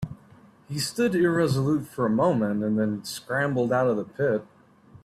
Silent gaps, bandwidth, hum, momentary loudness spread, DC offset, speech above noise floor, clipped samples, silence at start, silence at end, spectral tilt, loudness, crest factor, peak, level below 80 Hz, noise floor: none; 15.5 kHz; none; 8 LU; under 0.1%; 29 dB; under 0.1%; 0 s; 0.05 s; -6 dB/octave; -25 LUFS; 14 dB; -10 dBFS; -60 dBFS; -53 dBFS